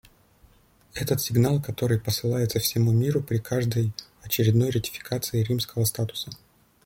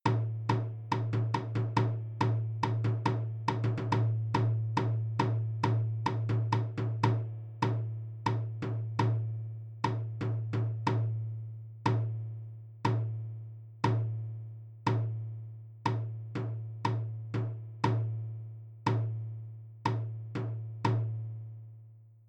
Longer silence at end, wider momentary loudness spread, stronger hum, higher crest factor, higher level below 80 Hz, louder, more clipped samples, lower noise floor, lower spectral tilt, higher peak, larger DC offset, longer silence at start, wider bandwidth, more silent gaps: first, 0.5 s vs 0.15 s; about the same, 9 LU vs 11 LU; neither; about the same, 16 dB vs 20 dB; first, -54 dBFS vs -62 dBFS; first, -25 LUFS vs -33 LUFS; neither; first, -58 dBFS vs -54 dBFS; second, -5.5 dB/octave vs -8 dB/octave; first, -8 dBFS vs -12 dBFS; neither; first, 0.95 s vs 0.05 s; first, 17 kHz vs 7 kHz; neither